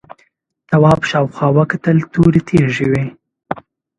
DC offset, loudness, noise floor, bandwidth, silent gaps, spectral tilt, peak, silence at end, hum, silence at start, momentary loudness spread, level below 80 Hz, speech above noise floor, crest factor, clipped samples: under 0.1%; -14 LUFS; -58 dBFS; 9.6 kHz; none; -8 dB/octave; 0 dBFS; 0.4 s; none; 0.7 s; 16 LU; -42 dBFS; 46 dB; 14 dB; under 0.1%